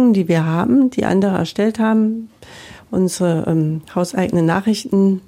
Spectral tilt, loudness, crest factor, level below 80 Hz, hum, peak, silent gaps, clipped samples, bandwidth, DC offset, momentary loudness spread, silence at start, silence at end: -7 dB/octave; -17 LUFS; 12 dB; -52 dBFS; none; -4 dBFS; none; under 0.1%; 15.5 kHz; under 0.1%; 6 LU; 0 s; 0.1 s